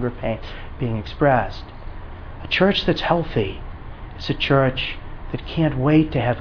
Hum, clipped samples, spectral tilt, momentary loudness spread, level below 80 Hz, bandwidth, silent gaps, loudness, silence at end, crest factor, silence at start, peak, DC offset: none; under 0.1%; -7.5 dB/octave; 20 LU; -34 dBFS; 5.4 kHz; none; -21 LUFS; 0 s; 18 dB; 0 s; -2 dBFS; under 0.1%